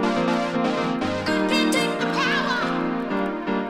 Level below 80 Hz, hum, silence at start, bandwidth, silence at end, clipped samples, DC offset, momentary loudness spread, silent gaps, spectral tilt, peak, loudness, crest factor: -54 dBFS; none; 0 s; 16 kHz; 0 s; under 0.1%; under 0.1%; 5 LU; none; -4.5 dB/octave; -8 dBFS; -23 LUFS; 14 dB